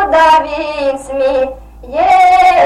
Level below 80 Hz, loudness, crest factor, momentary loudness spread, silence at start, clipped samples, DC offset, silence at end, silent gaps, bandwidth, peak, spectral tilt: -36 dBFS; -11 LUFS; 10 dB; 11 LU; 0 s; under 0.1%; under 0.1%; 0 s; none; 12.5 kHz; 0 dBFS; -3.5 dB/octave